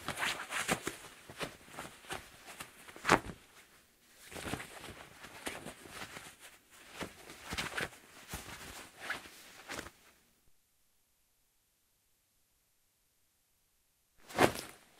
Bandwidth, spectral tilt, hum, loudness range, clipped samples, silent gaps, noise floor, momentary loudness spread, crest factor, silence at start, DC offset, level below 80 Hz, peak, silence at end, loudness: 16 kHz; -3 dB/octave; none; 11 LU; under 0.1%; none; -75 dBFS; 21 LU; 36 dB; 0 s; under 0.1%; -64 dBFS; -6 dBFS; 0.15 s; -39 LUFS